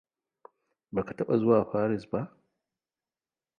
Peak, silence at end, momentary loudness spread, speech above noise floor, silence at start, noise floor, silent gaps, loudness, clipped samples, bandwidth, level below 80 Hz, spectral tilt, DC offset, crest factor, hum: -10 dBFS; 1.3 s; 11 LU; over 63 dB; 0.95 s; under -90 dBFS; none; -28 LUFS; under 0.1%; 6.8 kHz; -64 dBFS; -10 dB/octave; under 0.1%; 20 dB; none